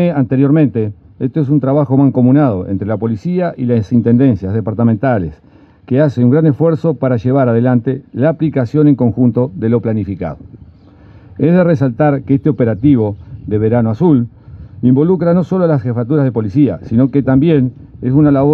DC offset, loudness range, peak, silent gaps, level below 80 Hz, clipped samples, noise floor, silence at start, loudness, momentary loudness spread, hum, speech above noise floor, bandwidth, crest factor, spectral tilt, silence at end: under 0.1%; 2 LU; 0 dBFS; none; -46 dBFS; under 0.1%; -40 dBFS; 0 s; -13 LUFS; 8 LU; none; 28 dB; 5.2 kHz; 12 dB; -11 dB/octave; 0 s